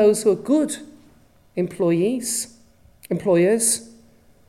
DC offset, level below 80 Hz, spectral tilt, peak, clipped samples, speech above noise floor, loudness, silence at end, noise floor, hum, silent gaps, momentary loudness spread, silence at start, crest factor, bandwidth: under 0.1%; -60 dBFS; -4.5 dB/octave; -6 dBFS; under 0.1%; 34 dB; -21 LUFS; 0.6 s; -54 dBFS; none; none; 12 LU; 0 s; 16 dB; 16 kHz